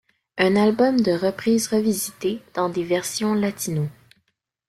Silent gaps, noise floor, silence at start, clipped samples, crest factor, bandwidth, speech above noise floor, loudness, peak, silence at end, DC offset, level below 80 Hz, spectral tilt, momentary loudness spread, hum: none; -72 dBFS; 0.35 s; under 0.1%; 18 dB; 15.5 kHz; 51 dB; -22 LUFS; -4 dBFS; 0.75 s; under 0.1%; -60 dBFS; -5 dB/octave; 9 LU; none